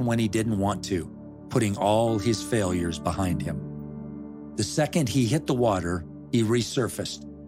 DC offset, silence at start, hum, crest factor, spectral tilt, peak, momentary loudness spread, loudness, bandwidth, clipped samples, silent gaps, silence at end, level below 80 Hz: under 0.1%; 0 s; none; 18 dB; -5.5 dB/octave; -8 dBFS; 14 LU; -26 LUFS; 16 kHz; under 0.1%; none; 0 s; -52 dBFS